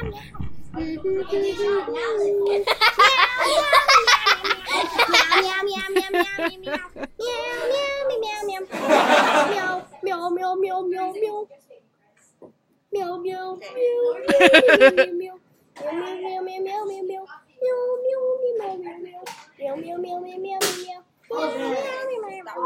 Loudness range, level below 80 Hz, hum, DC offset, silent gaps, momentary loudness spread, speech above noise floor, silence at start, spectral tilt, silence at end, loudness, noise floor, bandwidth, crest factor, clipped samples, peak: 11 LU; -52 dBFS; none; under 0.1%; none; 18 LU; 40 dB; 0 s; -2.5 dB/octave; 0 s; -20 LUFS; -61 dBFS; 16 kHz; 22 dB; under 0.1%; 0 dBFS